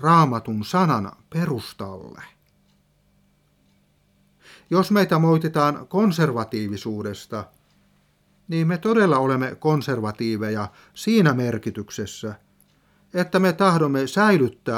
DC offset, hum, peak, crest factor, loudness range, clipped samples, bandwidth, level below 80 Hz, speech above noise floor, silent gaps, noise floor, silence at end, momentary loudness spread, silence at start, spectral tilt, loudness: under 0.1%; 50 Hz at -50 dBFS; -4 dBFS; 18 dB; 7 LU; under 0.1%; 16 kHz; -62 dBFS; 41 dB; none; -62 dBFS; 0 s; 15 LU; 0 s; -6.5 dB/octave; -21 LUFS